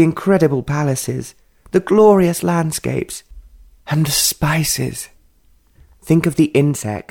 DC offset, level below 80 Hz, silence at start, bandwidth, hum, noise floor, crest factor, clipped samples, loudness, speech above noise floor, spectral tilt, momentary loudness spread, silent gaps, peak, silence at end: under 0.1%; -44 dBFS; 0 s; 19 kHz; none; -53 dBFS; 16 dB; under 0.1%; -16 LUFS; 38 dB; -5 dB/octave; 14 LU; none; -2 dBFS; 0.1 s